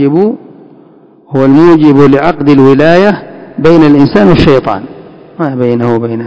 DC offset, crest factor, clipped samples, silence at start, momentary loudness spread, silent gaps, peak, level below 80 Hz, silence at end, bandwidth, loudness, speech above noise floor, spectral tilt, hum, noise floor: under 0.1%; 8 dB; 10%; 0 s; 13 LU; none; 0 dBFS; -34 dBFS; 0 s; 8 kHz; -6 LUFS; 33 dB; -8.5 dB/octave; none; -39 dBFS